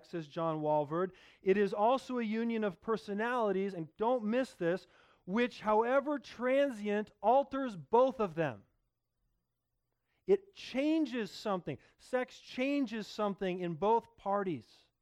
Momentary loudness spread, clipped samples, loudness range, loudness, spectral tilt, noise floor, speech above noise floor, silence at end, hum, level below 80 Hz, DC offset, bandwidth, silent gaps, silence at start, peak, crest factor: 9 LU; under 0.1%; 5 LU; -34 LUFS; -6.5 dB/octave; -85 dBFS; 52 dB; 0.4 s; none; -72 dBFS; under 0.1%; 12.5 kHz; none; 0.15 s; -16 dBFS; 18 dB